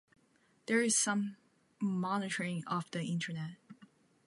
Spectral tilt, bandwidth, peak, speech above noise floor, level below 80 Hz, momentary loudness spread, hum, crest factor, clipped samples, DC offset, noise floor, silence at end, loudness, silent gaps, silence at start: -4 dB/octave; 11.5 kHz; -18 dBFS; 36 dB; -84 dBFS; 13 LU; none; 20 dB; under 0.1%; under 0.1%; -71 dBFS; 0.4 s; -34 LUFS; none; 0.7 s